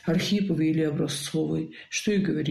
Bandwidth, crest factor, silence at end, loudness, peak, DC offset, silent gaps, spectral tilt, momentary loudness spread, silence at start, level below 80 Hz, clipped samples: 14.5 kHz; 12 dB; 0 s; -26 LUFS; -14 dBFS; under 0.1%; none; -5.5 dB/octave; 5 LU; 0.05 s; -56 dBFS; under 0.1%